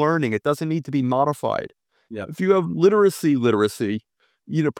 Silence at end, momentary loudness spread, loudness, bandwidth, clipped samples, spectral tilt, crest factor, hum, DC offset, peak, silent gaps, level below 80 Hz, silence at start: 0.05 s; 14 LU; -21 LUFS; 16.5 kHz; under 0.1%; -7 dB/octave; 16 dB; none; under 0.1%; -4 dBFS; none; -66 dBFS; 0 s